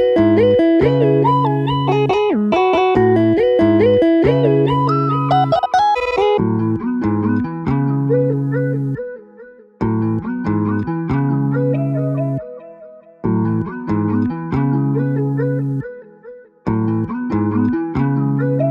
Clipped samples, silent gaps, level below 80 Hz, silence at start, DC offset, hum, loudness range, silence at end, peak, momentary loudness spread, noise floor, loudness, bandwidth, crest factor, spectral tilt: under 0.1%; none; -44 dBFS; 0 s; under 0.1%; none; 6 LU; 0 s; -2 dBFS; 9 LU; -41 dBFS; -16 LUFS; 6.4 kHz; 14 dB; -9 dB/octave